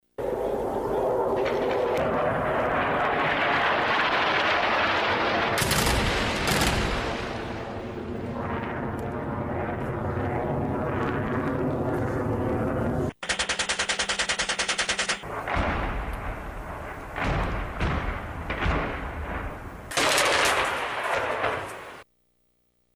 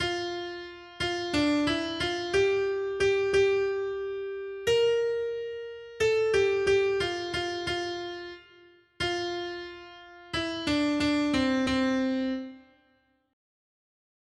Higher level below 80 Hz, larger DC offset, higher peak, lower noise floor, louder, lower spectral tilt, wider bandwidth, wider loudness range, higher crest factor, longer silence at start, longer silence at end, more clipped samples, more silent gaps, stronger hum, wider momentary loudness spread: first, -38 dBFS vs -56 dBFS; neither; first, -4 dBFS vs -14 dBFS; about the same, -69 dBFS vs -68 dBFS; about the same, -26 LUFS vs -28 LUFS; about the same, -4 dB/octave vs -4.5 dB/octave; first, over 20 kHz vs 11.5 kHz; about the same, 7 LU vs 5 LU; first, 22 dB vs 16 dB; first, 0.2 s vs 0 s; second, 0.95 s vs 1.7 s; neither; neither; neither; second, 11 LU vs 15 LU